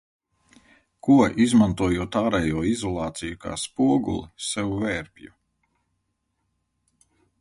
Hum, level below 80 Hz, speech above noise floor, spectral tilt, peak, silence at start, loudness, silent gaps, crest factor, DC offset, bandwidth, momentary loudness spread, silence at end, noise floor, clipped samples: none; -46 dBFS; 53 dB; -5.5 dB/octave; -6 dBFS; 1.05 s; -23 LUFS; none; 20 dB; under 0.1%; 11.5 kHz; 12 LU; 2.15 s; -75 dBFS; under 0.1%